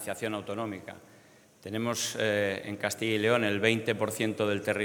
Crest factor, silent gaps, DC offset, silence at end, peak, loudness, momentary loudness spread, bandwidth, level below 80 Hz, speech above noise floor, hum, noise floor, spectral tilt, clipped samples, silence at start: 22 dB; none; under 0.1%; 0 s; -10 dBFS; -30 LUFS; 11 LU; 19.5 kHz; -74 dBFS; 28 dB; none; -58 dBFS; -4 dB/octave; under 0.1%; 0 s